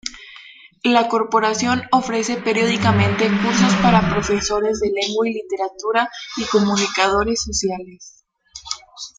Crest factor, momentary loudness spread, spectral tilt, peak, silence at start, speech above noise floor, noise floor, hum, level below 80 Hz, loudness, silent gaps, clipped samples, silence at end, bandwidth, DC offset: 18 dB; 13 LU; -4.5 dB/octave; 0 dBFS; 0.05 s; 25 dB; -43 dBFS; none; -42 dBFS; -18 LUFS; none; under 0.1%; 0.1 s; 9.4 kHz; under 0.1%